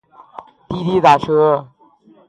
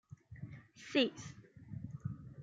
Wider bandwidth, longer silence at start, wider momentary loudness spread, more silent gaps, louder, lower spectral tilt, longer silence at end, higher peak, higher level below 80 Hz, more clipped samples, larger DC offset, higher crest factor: first, 10 kHz vs 9 kHz; first, 0.4 s vs 0.1 s; second, 11 LU vs 19 LU; neither; first, -14 LUFS vs -38 LUFS; first, -6.5 dB/octave vs -5 dB/octave; first, 0.65 s vs 0 s; first, 0 dBFS vs -18 dBFS; first, -50 dBFS vs -68 dBFS; neither; neither; second, 16 dB vs 22 dB